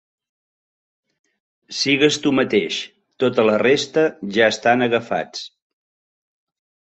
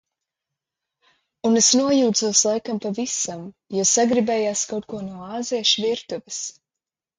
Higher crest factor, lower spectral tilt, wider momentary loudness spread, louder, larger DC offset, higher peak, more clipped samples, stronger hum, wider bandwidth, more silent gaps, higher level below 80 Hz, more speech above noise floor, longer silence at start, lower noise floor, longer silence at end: about the same, 20 dB vs 18 dB; first, -4 dB/octave vs -2.5 dB/octave; about the same, 15 LU vs 14 LU; about the same, -18 LUFS vs -20 LUFS; neither; about the same, -2 dBFS vs -4 dBFS; neither; neither; second, 8.2 kHz vs 10.5 kHz; neither; about the same, -62 dBFS vs -64 dBFS; first, over 72 dB vs 67 dB; first, 1.7 s vs 1.45 s; about the same, under -90 dBFS vs -88 dBFS; first, 1.4 s vs 0.65 s